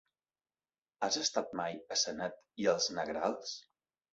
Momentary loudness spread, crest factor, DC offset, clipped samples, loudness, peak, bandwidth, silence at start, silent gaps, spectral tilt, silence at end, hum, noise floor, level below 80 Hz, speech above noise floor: 10 LU; 20 dB; under 0.1%; under 0.1%; -35 LUFS; -16 dBFS; 7.6 kHz; 1 s; none; -1.5 dB/octave; 0.55 s; none; under -90 dBFS; -74 dBFS; over 54 dB